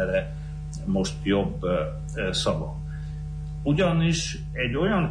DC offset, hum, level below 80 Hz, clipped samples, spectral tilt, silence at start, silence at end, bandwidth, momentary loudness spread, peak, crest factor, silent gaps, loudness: under 0.1%; 50 Hz at -35 dBFS; -36 dBFS; under 0.1%; -5.5 dB/octave; 0 s; 0 s; 10.5 kHz; 12 LU; -12 dBFS; 14 dB; none; -27 LUFS